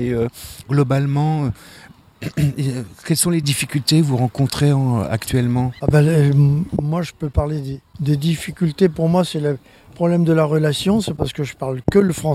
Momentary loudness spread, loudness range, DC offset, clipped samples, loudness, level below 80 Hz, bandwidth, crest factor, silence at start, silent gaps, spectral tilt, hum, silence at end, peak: 9 LU; 3 LU; under 0.1%; under 0.1%; -18 LUFS; -38 dBFS; 15 kHz; 16 dB; 0 s; none; -6 dB/octave; none; 0 s; -2 dBFS